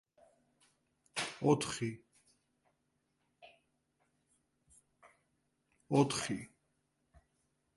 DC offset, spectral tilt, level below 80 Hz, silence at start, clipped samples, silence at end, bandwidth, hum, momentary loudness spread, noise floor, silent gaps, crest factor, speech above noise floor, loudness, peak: under 0.1%; -5 dB/octave; -72 dBFS; 1.15 s; under 0.1%; 1.3 s; 11.5 kHz; none; 12 LU; -81 dBFS; none; 26 dB; 48 dB; -35 LUFS; -14 dBFS